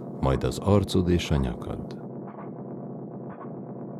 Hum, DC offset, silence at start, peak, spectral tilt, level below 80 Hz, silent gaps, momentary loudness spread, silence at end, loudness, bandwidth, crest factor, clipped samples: none; under 0.1%; 0 s; -8 dBFS; -7 dB/octave; -40 dBFS; none; 15 LU; 0 s; -28 LUFS; 14 kHz; 20 dB; under 0.1%